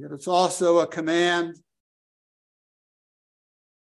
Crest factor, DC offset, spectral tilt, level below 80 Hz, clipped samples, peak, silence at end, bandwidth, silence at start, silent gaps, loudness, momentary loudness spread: 20 dB; under 0.1%; -4 dB/octave; -78 dBFS; under 0.1%; -6 dBFS; 2.3 s; 12.5 kHz; 0 s; none; -22 LUFS; 5 LU